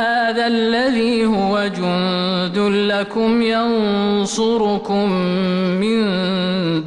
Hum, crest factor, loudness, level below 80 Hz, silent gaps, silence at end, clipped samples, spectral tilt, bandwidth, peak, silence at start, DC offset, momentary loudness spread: none; 8 dB; -17 LUFS; -50 dBFS; none; 0 s; under 0.1%; -5.5 dB/octave; 11 kHz; -8 dBFS; 0 s; under 0.1%; 2 LU